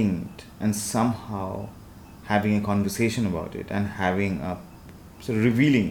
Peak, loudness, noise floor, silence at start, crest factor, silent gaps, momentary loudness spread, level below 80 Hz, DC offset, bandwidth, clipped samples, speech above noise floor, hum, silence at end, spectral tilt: -8 dBFS; -25 LUFS; -45 dBFS; 0 s; 16 dB; none; 20 LU; -50 dBFS; under 0.1%; 19 kHz; under 0.1%; 20 dB; none; 0 s; -6 dB/octave